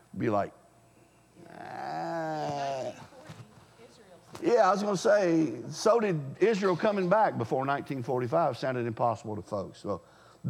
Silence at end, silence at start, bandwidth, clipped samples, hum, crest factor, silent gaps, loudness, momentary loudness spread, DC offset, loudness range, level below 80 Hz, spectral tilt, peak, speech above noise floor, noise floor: 0 s; 0.15 s; 15 kHz; under 0.1%; none; 18 dB; none; -29 LUFS; 15 LU; under 0.1%; 11 LU; -74 dBFS; -6 dB/octave; -12 dBFS; 33 dB; -60 dBFS